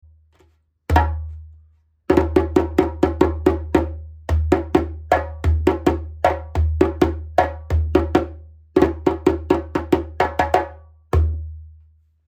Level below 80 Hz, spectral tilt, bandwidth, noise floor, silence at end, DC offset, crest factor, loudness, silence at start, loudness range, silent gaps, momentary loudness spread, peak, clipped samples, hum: -28 dBFS; -8 dB/octave; 9 kHz; -59 dBFS; 0.6 s; under 0.1%; 18 dB; -20 LUFS; 0.9 s; 1 LU; none; 9 LU; -2 dBFS; under 0.1%; none